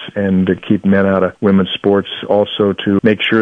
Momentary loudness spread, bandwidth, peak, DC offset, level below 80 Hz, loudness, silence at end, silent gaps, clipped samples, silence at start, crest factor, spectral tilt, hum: 3 LU; 3.9 kHz; 0 dBFS; under 0.1%; -52 dBFS; -14 LUFS; 0 s; none; under 0.1%; 0 s; 12 dB; -8.5 dB/octave; none